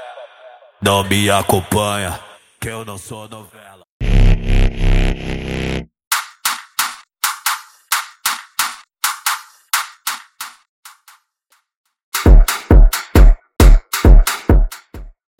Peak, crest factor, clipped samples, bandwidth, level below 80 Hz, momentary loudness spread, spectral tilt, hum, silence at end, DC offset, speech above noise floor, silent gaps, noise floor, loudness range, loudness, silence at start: 0 dBFS; 14 dB; under 0.1%; 17 kHz; -16 dBFS; 17 LU; -4.5 dB/octave; none; 0.3 s; under 0.1%; 43 dB; 3.89-4.00 s, 6.07-6.11 s, 10.69-10.83 s, 11.77-11.84 s, 12.03-12.12 s; -61 dBFS; 8 LU; -17 LUFS; 0 s